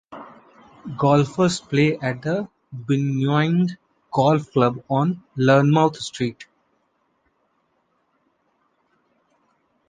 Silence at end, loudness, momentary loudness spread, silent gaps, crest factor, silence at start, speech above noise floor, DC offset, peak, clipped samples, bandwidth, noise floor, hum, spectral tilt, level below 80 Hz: 3.45 s; -21 LUFS; 18 LU; none; 20 dB; 0.1 s; 48 dB; under 0.1%; -2 dBFS; under 0.1%; 9.4 kHz; -68 dBFS; none; -6.5 dB/octave; -62 dBFS